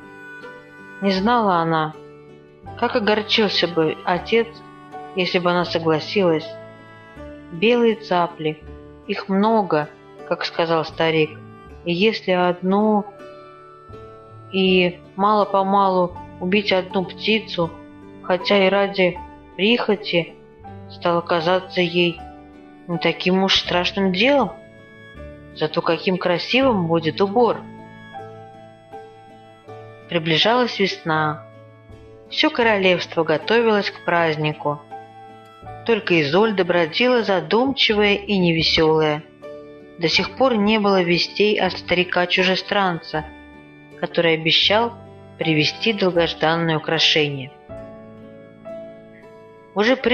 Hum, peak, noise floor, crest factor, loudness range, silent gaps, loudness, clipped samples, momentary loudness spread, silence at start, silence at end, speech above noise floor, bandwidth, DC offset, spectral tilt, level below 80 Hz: none; -4 dBFS; -45 dBFS; 16 dB; 4 LU; none; -19 LUFS; under 0.1%; 22 LU; 0 s; 0 s; 26 dB; 7.2 kHz; under 0.1%; -5.5 dB/octave; -52 dBFS